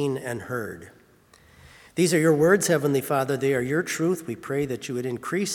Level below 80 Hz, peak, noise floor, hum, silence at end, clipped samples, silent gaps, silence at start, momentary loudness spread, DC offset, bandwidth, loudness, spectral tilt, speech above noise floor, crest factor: -62 dBFS; -6 dBFS; -56 dBFS; none; 0 s; under 0.1%; none; 0 s; 12 LU; under 0.1%; 18 kHz; -24 LUFS; -5 dB/octave; 32 dB; 18 dB